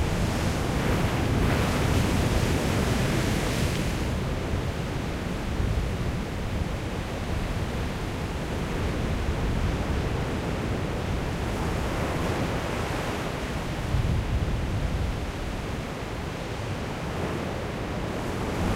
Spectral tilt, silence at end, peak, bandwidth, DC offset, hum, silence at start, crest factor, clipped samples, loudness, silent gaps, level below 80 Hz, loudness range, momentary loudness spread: -6 dB/octave; 0 s; -12 dBFS; 16 kHz; under 0.1%; none; 0 s; 16 dB; under 0.1%; -28 LUFS; none; -32 dBFS; 5 LU; 7 LU